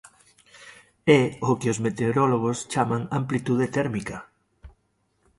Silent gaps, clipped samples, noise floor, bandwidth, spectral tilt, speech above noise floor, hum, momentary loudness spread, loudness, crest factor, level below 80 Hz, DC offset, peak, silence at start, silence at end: none; under 0.1%; -70 dBFS; 11.5 kHz; -6 dB/octave; 47 dB; none; 9 LU; -24 LUFS; 22 dB; -56 dBFS; under 0.1%; -4 dBFS; 0.6 s; 0.7 s